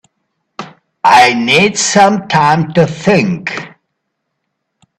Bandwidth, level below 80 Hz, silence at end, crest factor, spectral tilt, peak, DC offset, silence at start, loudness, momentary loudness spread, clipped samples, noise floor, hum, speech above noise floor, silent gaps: 13.5 kHz; -52 dBFS; 1.3 s; 12 dB; -4 dB/octave; 0 dBFS; under 0.1%; 0.6 s; -10 LUFS; 17 LU; under 0.1%; -71 dBFS; none; 61 dB; none